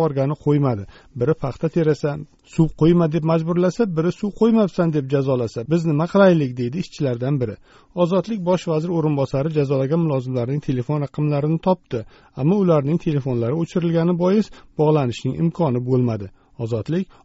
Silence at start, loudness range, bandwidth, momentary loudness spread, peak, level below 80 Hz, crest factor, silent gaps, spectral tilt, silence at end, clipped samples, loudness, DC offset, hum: 0 s; 2 LU; 8 kHz; 9 LU; -2 dBFS; -48 dBFS; 18 dB; none; -8 dB/octave; 0.2 s; under 0.1%; -20 LUFS; under 0.1%; none